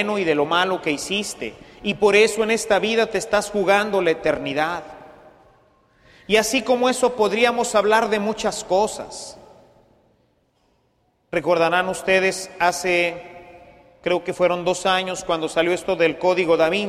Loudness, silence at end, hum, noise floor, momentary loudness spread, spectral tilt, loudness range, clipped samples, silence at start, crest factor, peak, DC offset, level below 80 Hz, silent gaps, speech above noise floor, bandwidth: -20 LUFS; 0 s; none; -65 dBFS; 10 LU; -3.5 dB/octave; 5 LU; under 0.1%; 0 s; 18 dB; -4 dBFS; under 0.1%; -54 dBFS; none; 45 dB; 14.5 kHz